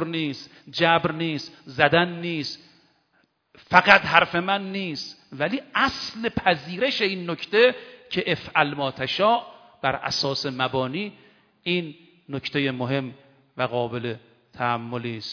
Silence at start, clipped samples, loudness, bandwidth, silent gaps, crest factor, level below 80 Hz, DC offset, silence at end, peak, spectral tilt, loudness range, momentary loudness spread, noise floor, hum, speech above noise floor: 0 s; under 0.1%; -23 LUFS; 5.4 kHz; none; 24 dB; -58 dBFS; under 0.1%; 0 s; 0 dBFS; -5 dB/octave; 7 LU; 14 LU; -67 dBFS; none; 43 dB